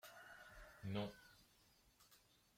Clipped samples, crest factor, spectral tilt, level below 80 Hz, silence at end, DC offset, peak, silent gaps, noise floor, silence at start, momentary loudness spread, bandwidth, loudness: under 0.1%; 22 dB; -6 dB/octave; -74 dBFS; 0.15 s; under 0.1%; -34 dBFS; none; -74 dBFS; 0.05 s; 22 LU; 16.5 kHz; -52 LUFS